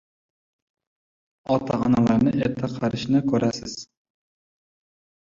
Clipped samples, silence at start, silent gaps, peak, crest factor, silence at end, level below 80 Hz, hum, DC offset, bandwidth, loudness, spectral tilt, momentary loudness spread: under 0.1%; 1.5 s; none; -8 dBFS; 18 dB; 1.45 s; -54 dBFS; none; under 0.1%; 7.6 kHz; -23 LUFS; -7 dB/octave; 14 LU